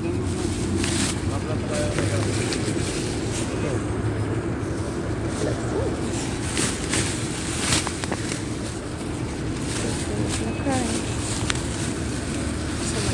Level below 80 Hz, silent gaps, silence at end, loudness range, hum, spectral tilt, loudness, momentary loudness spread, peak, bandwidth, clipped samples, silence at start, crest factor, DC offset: -38 dBFS; none; 0 s; 2 LU; none; -4.5 dB/octave; -25 LUFS; 5 LU; 0 dBFS; 11.5 kHz; under 0.1%; 0 s; 24 dB; under 0.1%